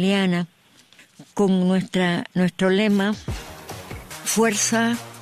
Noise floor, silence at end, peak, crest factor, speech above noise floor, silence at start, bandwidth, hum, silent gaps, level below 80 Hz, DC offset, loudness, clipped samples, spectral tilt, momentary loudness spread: -52 dBFS; 0 s; -8 dBFS; 14 dB; 32 dB; 0 s; 14.5 kHz; none; none; -48 dBFS; under 0.1%; -21 LUFS; under 0.1%; -4.5 dB/octave; 17 LU